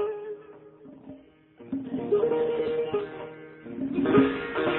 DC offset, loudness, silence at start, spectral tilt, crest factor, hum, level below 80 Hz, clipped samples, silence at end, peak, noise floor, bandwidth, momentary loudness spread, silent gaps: under 0.1%; -27 LUFS; 0 s; -10.5 dB/octave; 20 dB; none; -60 dBFS; under 0.1%; 0 s; -10 dBFS; -52 dBFS; 4.2 kHz; 23 LU; none